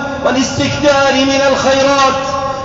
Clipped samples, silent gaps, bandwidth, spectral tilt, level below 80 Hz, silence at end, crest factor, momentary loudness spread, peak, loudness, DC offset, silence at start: under 0.1%; none; 7.8 kHz; -3.5 dB/octave; -38 dBFS; 0 s; 10 dB; 5 LU; -2 dBFS; -12 LUFS; 0.1%; 0 s